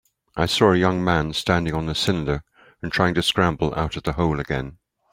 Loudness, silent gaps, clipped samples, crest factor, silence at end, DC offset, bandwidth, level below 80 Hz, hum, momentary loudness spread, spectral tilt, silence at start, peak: -22 LUFS; none; under 0.1%; 20 dB; 0.4 s; under 0.1%; 16 kHz; -40 dBFS; none; 10 LU; -5.5 dB/octave; 0.35 s; -2 dBFS